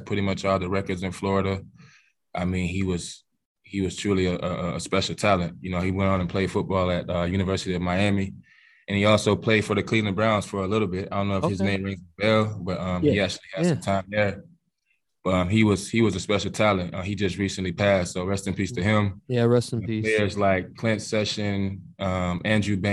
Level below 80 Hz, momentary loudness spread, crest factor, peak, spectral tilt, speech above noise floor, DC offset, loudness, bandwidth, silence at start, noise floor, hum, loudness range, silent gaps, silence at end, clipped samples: -52 dBFS; 7 LU; 20 dB; -6 dBFS; -6 dB/octave; 50 dB; under 0.1%; -25 LUFS; 12 kHz; 0 s; -74 dBFS; none; 4 LU; 3.45-3.55 s; 0 s; under 0.1%